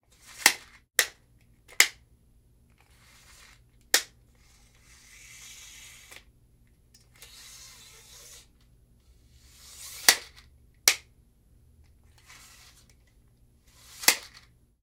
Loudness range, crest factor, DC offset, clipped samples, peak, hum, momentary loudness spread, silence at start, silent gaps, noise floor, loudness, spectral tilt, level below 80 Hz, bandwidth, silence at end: 21 LU; 34 dB; under 0.1%; under 0.1%; 0 dBFS; 60 Hz at -70 dBFS; 27 LU; 0.4 s; none; -61 dBFS; -24 LUFS; 1.5 dB/octave; -62 dBFS; 16 kHz; 0.65 s